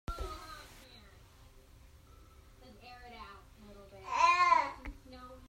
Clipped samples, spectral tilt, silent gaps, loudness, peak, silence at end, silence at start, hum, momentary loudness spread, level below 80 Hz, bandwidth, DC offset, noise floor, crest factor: under 0.1%; -3 dB/octave; none; -30 LUFS; -14 dBFS; 0.1 s; 0.1 s; none; 28 LU; -54 dBFS; 16 kHz; under 0.1%; -58 dBFS; 22 dB